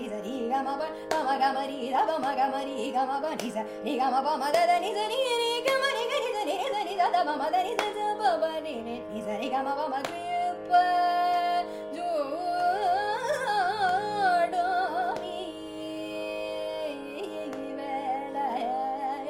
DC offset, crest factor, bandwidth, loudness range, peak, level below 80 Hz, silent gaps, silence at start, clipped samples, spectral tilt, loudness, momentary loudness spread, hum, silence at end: under 0.1%; 20 dB; 16 kHz; 6 LU; -8 dBFS; -66 dBFS; none; 0 s; under 0.1%; -3 dB/octave; -28 LUFS; 10 LU; none; 0 s